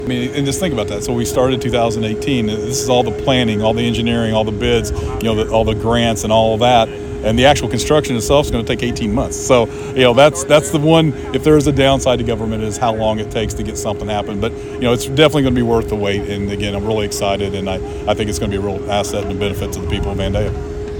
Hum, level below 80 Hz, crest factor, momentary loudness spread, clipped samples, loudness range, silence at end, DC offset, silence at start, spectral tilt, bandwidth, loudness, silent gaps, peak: none; -30 dBFS; 16 dB; 8 LU; under 0.1%; 6 LU; 0 s; under 0.1%; 0 s; -5 dB/octave; 19 kHz; -16 LUFS; none; 0 dBFS